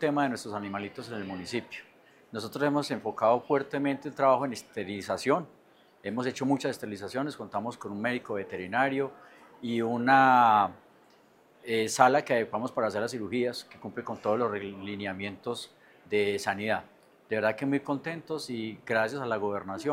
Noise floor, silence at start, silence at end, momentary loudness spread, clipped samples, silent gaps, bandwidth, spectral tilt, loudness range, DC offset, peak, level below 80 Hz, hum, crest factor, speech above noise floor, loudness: -61 dBFS; 0 s; 0 s; 14 LU; under 0.1%; none; 16 kHz; -5 dB/octave; 7 LU; under 0.1%; -6 dBFS; -76 dBFS; none; 24 dB; 32 dB; -29 LUFS